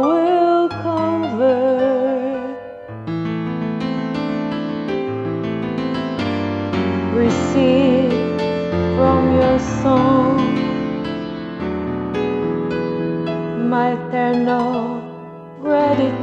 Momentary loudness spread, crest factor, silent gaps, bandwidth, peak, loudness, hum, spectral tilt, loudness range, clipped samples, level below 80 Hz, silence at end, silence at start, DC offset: 10 LU; 14 dB; none; 8 kHz; -4 dBFS; -19 LUFS; none; -7.5 dB/octave; 6 LU; under 0.1%; -44 dBFS; 0 s; 0 s; under 0.1%